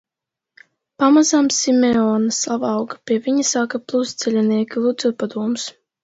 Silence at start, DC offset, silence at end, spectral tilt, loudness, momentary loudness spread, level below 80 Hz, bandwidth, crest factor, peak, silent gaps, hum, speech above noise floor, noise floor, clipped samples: 1 s; under 0.1%; 0.35 s; -3.5 dB/octave; -18 LUFS; 9 LU; -62 dBFS; 8 kHz; 18 dB; -2 dBFS; none; none; 68 dB; -85 dBFS; under 0.1%